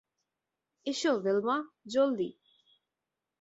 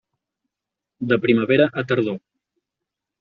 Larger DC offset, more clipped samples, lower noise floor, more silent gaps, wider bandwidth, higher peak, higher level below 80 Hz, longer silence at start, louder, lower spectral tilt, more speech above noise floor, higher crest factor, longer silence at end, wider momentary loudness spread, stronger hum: neither; neither; about the same, -89 dBFS vs -86 dBFS; neither; first, 8 kHz vs 6.6 kHz; second, -16 dBFS vs -2 dBFS; second, -80 dBFS vs -62 dBFS; second, 0.85 s vs 1 s; second, -31 LUFS vs -19 LUFS; about the same, -4.5 dB/octave vs -5 dB/octave; second, 59 dB vs 67 dB; about the same, 16 dB vs 20 dB; about the same, 1.1 s vs 1.05 s; second, 9 LU vs 13 LU; neither